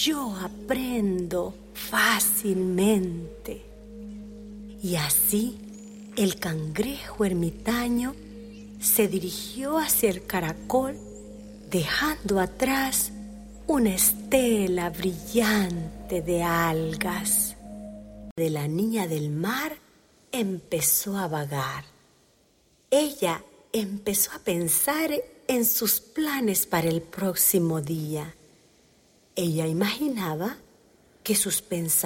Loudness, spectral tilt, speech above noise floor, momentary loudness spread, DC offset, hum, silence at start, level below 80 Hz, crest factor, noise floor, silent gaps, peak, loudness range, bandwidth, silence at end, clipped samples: -25 LUFS; -3.5 dB/octave; 37 dB; 19 LU; under 0.1%; none; 0 s; -50 dBFS; 20 dB; -63 dBFS; 18.31-18.36 s; -8 dBFS; 4 LU; 16.5 kHz; 0 s; under 0.1%